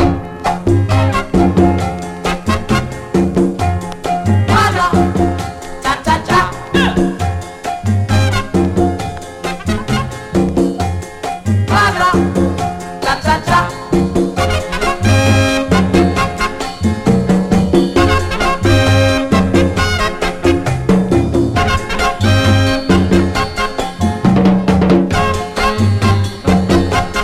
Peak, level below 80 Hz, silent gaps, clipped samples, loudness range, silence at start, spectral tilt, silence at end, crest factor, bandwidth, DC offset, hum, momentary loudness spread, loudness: 0 dBFS; -28 dBFS; none; under 0.1%; 3 LU; 0 s; -6 dB/octave; 0 s; 14 dB; 14.5 kHz; under 0.1%; none; 8 LU; -14 LUFS